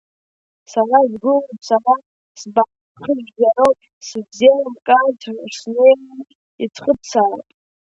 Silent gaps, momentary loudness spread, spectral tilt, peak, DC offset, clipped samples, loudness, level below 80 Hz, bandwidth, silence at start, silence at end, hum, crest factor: 2.06-2.35 s, 2.81-2.95 s, 3.93-4.01 s, 6.35-6.59 s; 15 LU; -4 dB/octave; 0 dBFS; under 0.1%; under 0.1%; -16 LUFS; -62 dBFS; 8 kHz; 0.7 s; 0.5 s; none; 16 dB